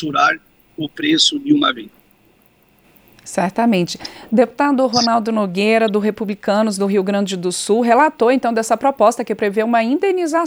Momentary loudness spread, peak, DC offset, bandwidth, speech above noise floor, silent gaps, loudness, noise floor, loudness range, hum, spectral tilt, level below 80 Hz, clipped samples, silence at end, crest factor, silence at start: 8 LU; -2 dBFS; under 0.1%; over 20 kHz; 38 dB; none; -16 LUFS; -54 dBFS; 4 LU; none; -4 dB/octave; -60 dBFS; under 0.1%; 0 s; 16 dB; 0 s